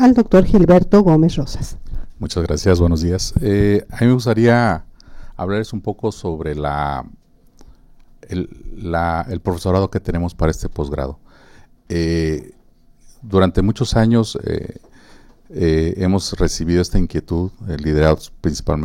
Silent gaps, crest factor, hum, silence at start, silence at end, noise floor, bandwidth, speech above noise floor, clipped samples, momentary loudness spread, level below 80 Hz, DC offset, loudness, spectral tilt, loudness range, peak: none; 16 dB; none; 0 s; 0 s; -49 dBFS; 16 kHz; 33 dB; under 0.1%; 14 LU; -28 dBFS; under 0.1%; -17 LUFS; -7 dB/octave; 8 LU; -2 dBFS